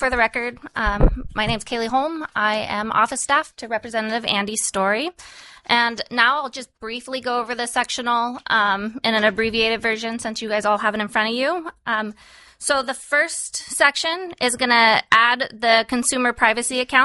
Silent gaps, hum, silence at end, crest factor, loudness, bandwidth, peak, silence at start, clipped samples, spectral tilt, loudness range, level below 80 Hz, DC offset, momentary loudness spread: none; none; 0 s; 20 dB; -20 LUFS; 11.5 kHz; 0 dBFS; 0 s; under 0.1%; -2.5 dB/octave; 4 LU; -36 dBFS; under 0.1%; 9 LU